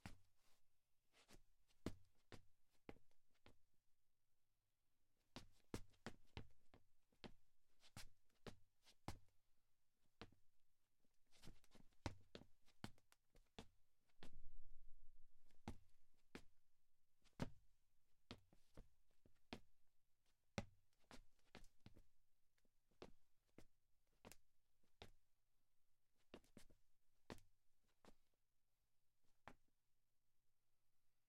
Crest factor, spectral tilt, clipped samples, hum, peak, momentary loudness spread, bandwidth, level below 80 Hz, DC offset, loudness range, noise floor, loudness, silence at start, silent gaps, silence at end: 32 dB; -5 dB/octave; under 0.1%; none; -28 dBFS; 13 LU; 13 kHz; -72 dBFS; under 0.1%; 5 LU; -83 dBFS; -63 LUFS; 0.05 s; none; 0.05 s